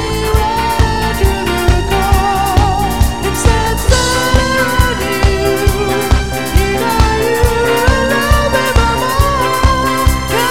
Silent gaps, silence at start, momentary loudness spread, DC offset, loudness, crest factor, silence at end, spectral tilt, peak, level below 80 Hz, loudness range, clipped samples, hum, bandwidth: none; 0 s; 3 LU; 3%; -13 LUFS; 12 dB; 0 s; -4.5 dB/octave; 0 dBFS; -16 dBFS; 1 LU; 0.2%; none; 17 kHz